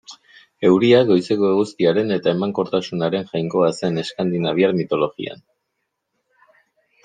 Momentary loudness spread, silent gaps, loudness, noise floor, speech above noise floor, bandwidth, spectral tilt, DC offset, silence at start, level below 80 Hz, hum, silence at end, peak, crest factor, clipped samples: 9 LU; none; -19 LUFS; -76 dBFS; 58 dB; 9.4 kHz; -6.5 dB/octave; under 0.1%; 0.1 s; -64 dBFS; none; 1.7 s; -2 dBFS; 18 dB; under 0.1%